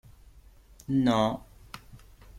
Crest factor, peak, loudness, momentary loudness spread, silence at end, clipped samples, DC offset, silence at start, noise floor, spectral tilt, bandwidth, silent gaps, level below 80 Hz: 20 dB; -12 dBFS; -27 LUFS; 23 LU; 0 s; under 0.1%; under 0.1%; 0.9 s; -54 dBFS; -6.5 dB/octave; 15 kHz; none; -54 dBFS